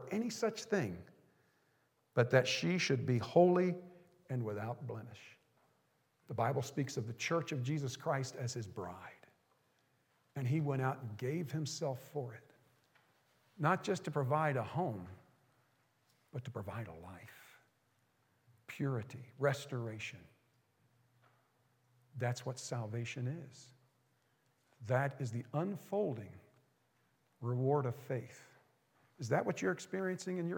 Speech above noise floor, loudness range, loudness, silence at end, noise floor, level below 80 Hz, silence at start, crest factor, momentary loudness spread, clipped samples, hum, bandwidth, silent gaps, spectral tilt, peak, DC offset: 40 dB; 11 LU; -38 LUFS; 0 s; -77 dBFS; -84 dBFS; 0 s; 24 dB; 16 LU; under 0.1%; none; 17.5 kHz; none; -6 dB/octave; -14 dBFS; under 0.1%